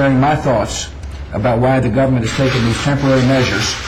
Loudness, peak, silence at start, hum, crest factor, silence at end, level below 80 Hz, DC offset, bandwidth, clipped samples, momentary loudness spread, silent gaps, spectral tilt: -15 LUFS; -6 dBFS; 0 s; none; 8 dB; 0 s; -30 dBFS; under 0.1%; 12.5 kHz; under 0.1%; 10 LU; none; -5.5 dB/octave